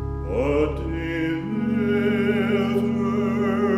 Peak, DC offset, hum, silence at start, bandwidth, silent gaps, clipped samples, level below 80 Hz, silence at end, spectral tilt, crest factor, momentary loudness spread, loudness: -10 dBFS; under 0.1%; none; 0 s; 13 kHz; none; under 0.1%; -36 dBFS; 0 s; -8 dB/octave; 12 dB; 4 LU; -23 LUFS